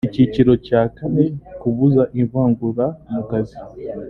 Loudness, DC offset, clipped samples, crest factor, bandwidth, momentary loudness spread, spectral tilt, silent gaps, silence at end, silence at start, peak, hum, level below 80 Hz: -18 LUFS; under 0.1%; under 0.1%; 16 dB; 5.2 kHz; 11 LU; -10.5 dB/octave; none; 0 s; 0.05 s; -2 dBFS; none; -44 dBFS